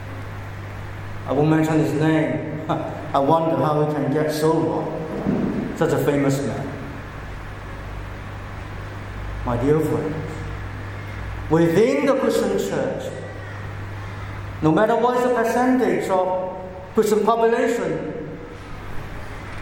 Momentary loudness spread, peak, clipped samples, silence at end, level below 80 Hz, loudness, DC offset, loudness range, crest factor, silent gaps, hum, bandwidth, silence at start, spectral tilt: 16 LU; -4 dBFS; under 0.1%; 0 s; -40 dBFS; -21 LUFS; under 0.1%; 6 LU; 18 dB; none; none; 17 kHz; 0 s; -7 dB/octave